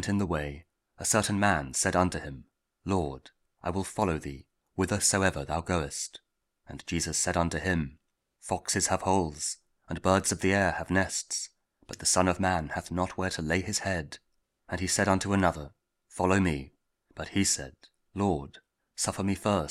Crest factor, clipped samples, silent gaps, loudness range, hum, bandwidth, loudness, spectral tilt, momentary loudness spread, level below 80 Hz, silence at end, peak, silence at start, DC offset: 22 dB; under 0.1%; none; 3 LU; none; 16 kHz; -29 LUFS; -4 dB/octave; 17 LU; -50 dBFS; 0 s; -8 dBFS; 0 s; under 0.1%